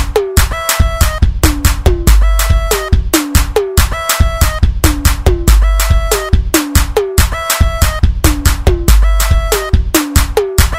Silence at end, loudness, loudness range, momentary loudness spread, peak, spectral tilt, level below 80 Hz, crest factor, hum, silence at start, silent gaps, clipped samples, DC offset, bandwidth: 0 s; -12 LUFS; 0 LU; 2 LU; 0 dBFS; -4.5 dB/octave; -12 dBFS; 10 dB; none; 0 s; none; 0.2%; under 0.1%; 16.5 kHz